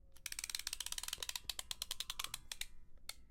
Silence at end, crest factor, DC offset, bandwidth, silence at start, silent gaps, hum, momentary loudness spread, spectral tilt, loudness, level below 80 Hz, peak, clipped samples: 0 s; 28 dB; under 0.1%; 17 kHz; 0.05 s; none; none; 8 LU; 1.5 dB/octave; -44 LUFS; -58 dBFS; -18 dBFS; under 0.1%